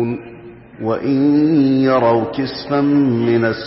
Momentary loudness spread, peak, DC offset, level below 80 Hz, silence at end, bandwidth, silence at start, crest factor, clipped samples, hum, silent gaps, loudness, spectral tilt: 10 LU; -4 dBFS; under 0.1%; -52 dBFS; 0 s; 5.8 kHz; 0 s; 10 dB; under 0.1%; none; none; -16 LUFS; -11.5 dB/octave